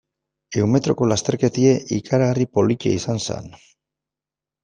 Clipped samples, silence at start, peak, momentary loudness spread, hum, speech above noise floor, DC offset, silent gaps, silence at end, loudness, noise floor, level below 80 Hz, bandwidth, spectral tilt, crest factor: under 0.1%; 0.5 s; -4 dBFS; 8 LU; none; 69 dB; under 0.1%; none; 1.15 s; -20 LUFS; -89 dBFS; -54 dBFS; 9.8 kHz; -6 dB/octave; 18 dB